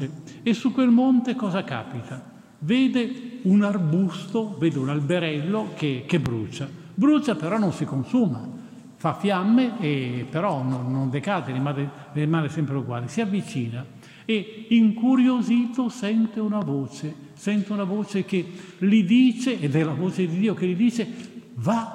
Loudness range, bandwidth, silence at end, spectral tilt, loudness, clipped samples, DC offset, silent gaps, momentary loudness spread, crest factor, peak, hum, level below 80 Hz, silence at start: 4 LU; 10.5 kHz; 0 s; -7 dB/octave; -24 LUFS; under 0.1%; under 0.1%; none; 13 LU; 16 dB; -8 dBFS; none; -66 dBFS; 0 s